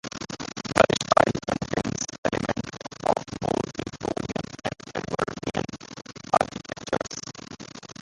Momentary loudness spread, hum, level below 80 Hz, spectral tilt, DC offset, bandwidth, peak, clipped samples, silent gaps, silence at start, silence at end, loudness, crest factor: 17 LU; none; -52 dBFS; -4.5 dB/octave; under 0.1%; 11.5 kHz; 0 dBFS; under 0.1%; 2.18-2.23 s; 0.05 s; 0 s; -27 LUFS; 28 dB